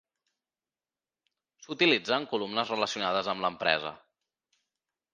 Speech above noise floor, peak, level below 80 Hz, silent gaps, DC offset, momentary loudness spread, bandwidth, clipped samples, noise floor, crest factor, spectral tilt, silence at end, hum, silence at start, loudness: over 61 dB; -6 dBFS; -74 dBFS; none; under 0.1%; 7 LU; 9.6 kHz; under 0.1%; under -90 dBFS; 26 dB; -3.5 dB/octave; 1.15 s; none; 1.6 s; -28 LUFS